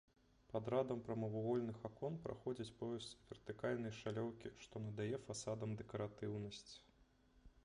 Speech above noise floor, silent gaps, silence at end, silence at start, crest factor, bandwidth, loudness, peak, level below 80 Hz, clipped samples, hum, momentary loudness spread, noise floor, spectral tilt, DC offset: 27 dB; none; 0.05 s; 0.5 s; 20 dB; 10.5 kHz; -46 LUFS; -26 dBFS; -72 dBFS; under 0.1%; none; 12 LU; -72 dBFS; -6 dB/octave; under 0.1%